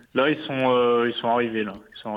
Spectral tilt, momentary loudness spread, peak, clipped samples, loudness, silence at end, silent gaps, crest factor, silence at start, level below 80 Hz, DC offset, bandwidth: -7.5 dB/octave; 10 LU; -8 dBFS; under 0.1%; -23 LUFS; 0 s; none; 16 dB; 0.15 s; -64 dBFS; under 0.1%; 5 kHz